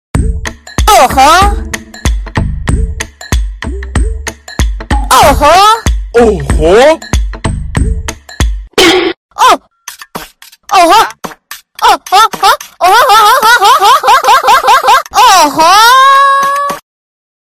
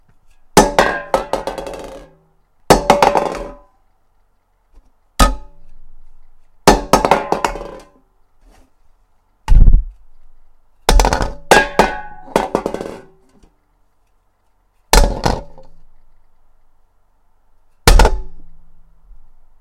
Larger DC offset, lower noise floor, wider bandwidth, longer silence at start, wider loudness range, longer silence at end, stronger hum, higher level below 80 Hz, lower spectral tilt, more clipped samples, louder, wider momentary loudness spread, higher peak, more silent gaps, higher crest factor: neither; second, -32 dBFS vs -58 dBFS; first, over 20 kHz vs 17 kHz; second, 0.15 s vs 0.55 s; about the same, 7 LU vs 5 LU; second, 0.7 s vs 1.05 s; neither; about the same, -18 dBFS vs -20 dBFS; about the same, -3.5 dB/octave vs -4 dB/octave; first, 2% vs 0.4%; first, -7 LUFS vs -15 LUFS; second, 16 LU vs 19 LU; about the same, 0 dBFS vs 0 dBFS; first, 9.17-9.29 s vs none; second, 8 dB vs 16 dB